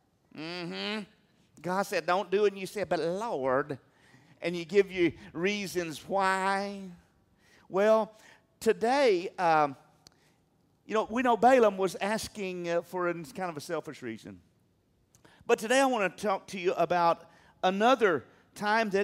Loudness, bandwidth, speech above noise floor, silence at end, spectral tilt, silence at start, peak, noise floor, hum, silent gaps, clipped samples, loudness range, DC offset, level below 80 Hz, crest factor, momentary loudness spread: -29 LUFS; 16 kHz; 41 dB; 0 s; -4.5 dB/octave; 0.35 s; -10 dBFS; -69 dBFS; none; none; under 0.1%; 4 LU; under 0.1%; -68 dBFS; 20 dB; 13 LU